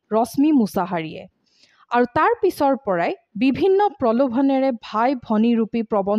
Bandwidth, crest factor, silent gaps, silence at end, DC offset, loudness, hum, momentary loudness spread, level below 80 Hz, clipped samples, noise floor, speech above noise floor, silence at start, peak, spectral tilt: 14.5 kHz; 14 dB; none; 0 s; under 0.1%; -20 LUFS; none; 6 LU; -58 dBFS; under 0.1%; -57 dBFS; 38 dB; 0.1 s; -6 dBFS; -6.5 dB/octave